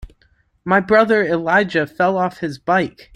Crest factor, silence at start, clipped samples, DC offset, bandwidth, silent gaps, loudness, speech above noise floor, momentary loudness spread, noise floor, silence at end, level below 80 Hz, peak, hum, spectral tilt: 16 dB; 0 s; under 0.1%; under 0.1%; 13.5 kHz; none; -17 LUFS; 42 dB; 8 LU; -59 dBFS; 0.25 s; -48 dBFS; -2 dBFS; none; -6.5 dB/octave